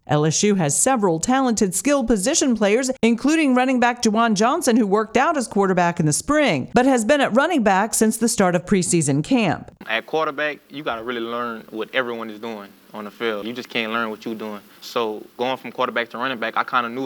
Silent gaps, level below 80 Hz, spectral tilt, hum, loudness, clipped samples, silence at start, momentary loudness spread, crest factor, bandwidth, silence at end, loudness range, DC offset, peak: none; -50 dBFS; -4 dB/octave; none; -20 LUFS; under 0.1%; 0.1 s; 11 LU; 18 dB; 20 kHz; 0 s; 9 LU; under 0.1%; -2 dBFS